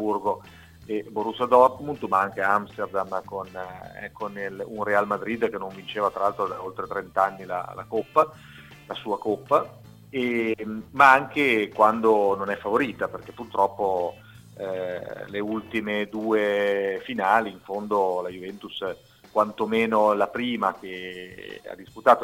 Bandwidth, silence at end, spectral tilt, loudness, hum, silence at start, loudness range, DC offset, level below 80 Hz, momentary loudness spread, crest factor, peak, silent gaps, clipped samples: 16.5 kHz; 0 s; -5.5 dB/octave; -25 LUFS; none; 0 s; 7 LU; under 0.1%; -62 dBFS; 15 LU; 22 dB; -2 dBFS; none; under 0.1%